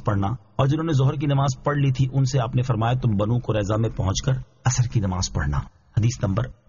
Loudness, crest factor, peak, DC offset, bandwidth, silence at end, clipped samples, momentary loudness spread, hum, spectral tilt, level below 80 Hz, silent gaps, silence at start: -23 LUFS; 14 dB; -8 dBFS; 0.1%; 7.4 kHz; 0.15 s; under 0.1%; 4 LU; none; -7 dB/octave; -38 dBFS; none; 0 s